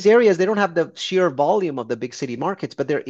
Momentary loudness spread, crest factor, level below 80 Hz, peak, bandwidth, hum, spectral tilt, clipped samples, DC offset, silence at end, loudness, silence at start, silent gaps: 11 LU; 16 dB; -68 dBFS; -4 dBFS; 8 kHz; none; -5.5 dB/octave; under 0.1%; under 0.1%; 0 s; -20 LUFS; 0 s; none